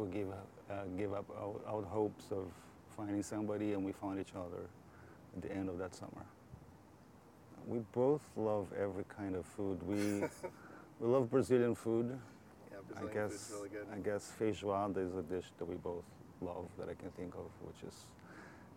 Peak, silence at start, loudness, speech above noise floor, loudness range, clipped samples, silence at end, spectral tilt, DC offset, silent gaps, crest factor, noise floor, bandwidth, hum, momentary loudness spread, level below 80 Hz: -20 dBFS; 0 s; -41 LUFS; 21 dB; 9 LU; under 0.1%; 0 s; -6.5 dB/octave; under 0.1%; none; 20 dB; -61 dBFS; 17.5 kHz; none; 20 LU; -72 dBFS